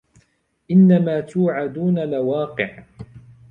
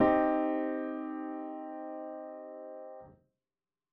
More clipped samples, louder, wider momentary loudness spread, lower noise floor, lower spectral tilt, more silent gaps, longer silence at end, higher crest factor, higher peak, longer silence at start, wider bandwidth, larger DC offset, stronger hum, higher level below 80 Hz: neither; first, -19 LUFS vs -35 LUFS; second, 12 LU vs 17 LU; second, -63 dBFS vs under -90 dBFS; first, -9.5 dB/octave vs -5.5 dB/octave; neither; second, 0.3 s vs 0.8 s; about the same, 16 dB vs 20 dB; first, -4 dBFS vs -14 dBFS; first, 0.7 s vs 0 s; about the same, 4.2 kHz vs 4.3 kHz; neither; neither; first, -58 dBFS vs -64 dBFS